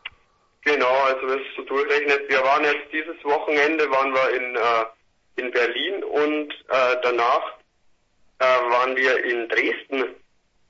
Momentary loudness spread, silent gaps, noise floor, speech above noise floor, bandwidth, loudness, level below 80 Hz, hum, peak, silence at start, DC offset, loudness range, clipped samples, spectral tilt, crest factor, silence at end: 8 LU; none; -62 dBFS; 40 dB; 7.6 kHz; -21 LUFS; -68 dBFS; none; -6 dBFS; 0.05 s; under 0.1%; 2 LU; under 0.1%; -3 dB/octave; 16 dB; 0.55 s